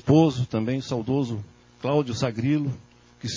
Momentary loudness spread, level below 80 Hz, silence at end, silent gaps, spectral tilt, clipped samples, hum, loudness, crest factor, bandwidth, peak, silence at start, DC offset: 15 LU; -52 dBFS; 0 s; none; -7 dB/octave; under 0.1%; none; -25 LUFS; 20 dB; 7.6 kHz; -4 dBFS; 0.05 s; under 0.1%